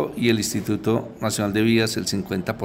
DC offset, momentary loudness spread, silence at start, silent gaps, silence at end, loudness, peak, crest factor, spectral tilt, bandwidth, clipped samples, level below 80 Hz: under 0.1%; 6 LU; 0 s; none; 0 s; -22 LUFS; -6 dBFS; 16 dB; -4.5 dB/octave; 16 kHz; under 0.1%; -52 dBFS